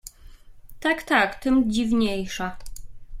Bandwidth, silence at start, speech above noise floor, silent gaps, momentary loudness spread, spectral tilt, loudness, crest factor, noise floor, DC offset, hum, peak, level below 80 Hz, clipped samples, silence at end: 16 kHz; 0.05 s; 23 dB; none; 20 LU; -4.5 dB/octave; -23 LUFS; 18 dB; -45 dBFS; under 0.1%; none; -6 dBFS; -42 dBFS; under 0.1%; 0 s